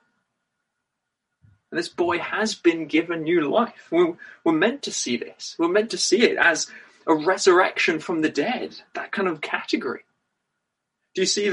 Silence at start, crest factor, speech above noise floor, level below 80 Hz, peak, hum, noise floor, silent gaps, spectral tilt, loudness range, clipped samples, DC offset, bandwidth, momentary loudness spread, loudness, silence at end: 1.7 s; 20 dB; 59 dB; -70 dBFS; -4 dBFS; none; -81 dBFS; none; -3 dB/octave; 6 LU; under 0.1%; under 0.1%; 11.5 kHz; 12 LU; -22 LUFS; 0 s